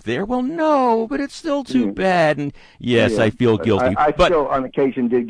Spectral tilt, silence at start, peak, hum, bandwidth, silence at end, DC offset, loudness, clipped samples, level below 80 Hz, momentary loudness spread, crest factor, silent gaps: -6.5 dB/octave; 0.05 s; -4 dBFS; none; 10.5 kHz; 0 s; under 0.1%; -18 LUFS; under 0.1%; -42 dBFS; 8 LU; 14 dB; none